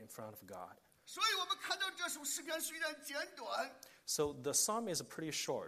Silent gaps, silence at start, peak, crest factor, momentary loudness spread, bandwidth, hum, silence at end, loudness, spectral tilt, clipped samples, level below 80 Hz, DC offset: none; 0 s; -22 dBFS; 20 dB; 17 LU; 15 kHz; none; 0 s; -38 LUFS; -1 dB/octave; under 0.1%; -76 dBFS; under 0.1%